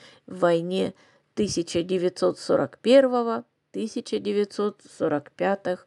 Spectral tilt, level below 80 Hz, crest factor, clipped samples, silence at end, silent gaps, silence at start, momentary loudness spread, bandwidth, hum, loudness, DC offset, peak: -5.5 dB/octave; -62 dBFS; 20 dB; under 0.1%; 0.1 s; none; 0.3 s; 13 LU; 11.5 kHz; none; -25 LUFS; under 0.1%; -6 dBFS